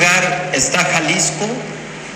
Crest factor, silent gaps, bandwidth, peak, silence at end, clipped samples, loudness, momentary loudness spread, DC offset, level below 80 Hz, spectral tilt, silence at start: 16 dB; none; 19.5 kHz; 0 dBFS; 0 s; under 0.1%; -15 LUFS; 13 LU; under 0.1%; -50 dBFS; -2 dB/octave; 0 s